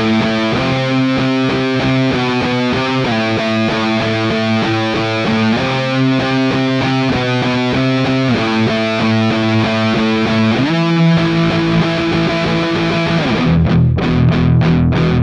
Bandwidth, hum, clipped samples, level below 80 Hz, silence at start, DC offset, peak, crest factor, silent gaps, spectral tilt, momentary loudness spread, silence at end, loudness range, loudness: 9.6 kHz; none; under 0.1%; -36 dBFS; 0 s; under 0.1%; -2 dBFS; 10 dB; none; -6.5 dB/octave; 3 LU; 0 s; 1 LU; -14 LUFS